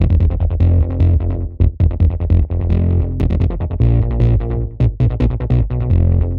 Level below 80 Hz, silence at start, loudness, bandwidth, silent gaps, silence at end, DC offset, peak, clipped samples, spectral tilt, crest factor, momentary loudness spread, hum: -20 dBFS; 0 s; -16 LUFS; 4.1 kHz; none; 0 s; under 0.1%; 0 dBFS; under 0.1%; -11 dB/octave; 14 dB; 4 LU; none